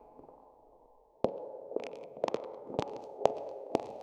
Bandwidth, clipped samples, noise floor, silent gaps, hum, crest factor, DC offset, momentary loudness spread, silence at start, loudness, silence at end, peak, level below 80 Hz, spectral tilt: 11.5 kHz; under 0.1%; -63 dBFS; none; none; 32 dB; under 0.1%; 12 LU; 0 s; -37 LUFS; 0 s; -6 dBFS; -68 dBFS; -6 dB/octave